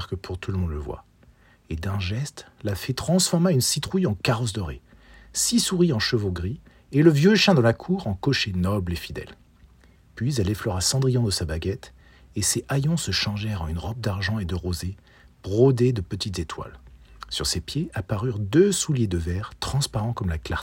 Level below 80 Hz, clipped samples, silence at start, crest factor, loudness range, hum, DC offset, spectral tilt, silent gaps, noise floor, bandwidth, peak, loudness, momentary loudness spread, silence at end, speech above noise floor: -44 dBFS; under 0.1%; 0 s; 22 dB; 5 LU; none; under 0.1%; -5 dB/octave; none; -55 dBFS; 16.5 kHz; -2 dBFS; -24 LUFS; 15 LU; 0 s; 32 dB